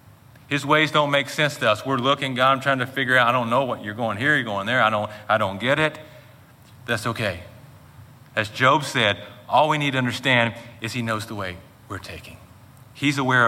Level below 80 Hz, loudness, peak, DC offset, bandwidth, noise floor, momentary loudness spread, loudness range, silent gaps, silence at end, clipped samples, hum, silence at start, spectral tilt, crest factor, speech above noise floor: -60 dBFS; -21 LUFS; -2 dBFS; under 0.1%; 16.5 kHz; -49 dBFS; 14 LU; 6 LU; none; 0 s; under 0.1%; none; 0.5 s; -4.5 dB/octave; 20 dB; 27 dB